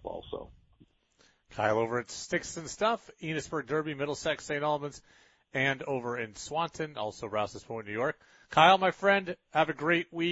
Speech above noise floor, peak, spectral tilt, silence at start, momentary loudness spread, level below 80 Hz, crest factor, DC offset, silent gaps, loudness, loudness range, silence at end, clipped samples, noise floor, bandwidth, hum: 37 dB; -6 dBFS; -4 dB/octave; 0.05 s; 13 LU; -64 dBFS; 24 dB; under 0.1%; none; -30 LUFS; 6 LU; 0 s; under 0.1%; -67 dBFS; 8 kHz; none